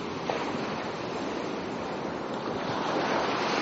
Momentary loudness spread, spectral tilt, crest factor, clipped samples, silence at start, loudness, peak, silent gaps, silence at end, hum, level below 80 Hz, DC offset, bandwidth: 6 LU; -3 dB/octave; 20 dB; under 0.1%; 0 s; -31 LUFS; -12 dBFS; none; 0 s; none; -60 dBFS; under 0.1%; 8 kHz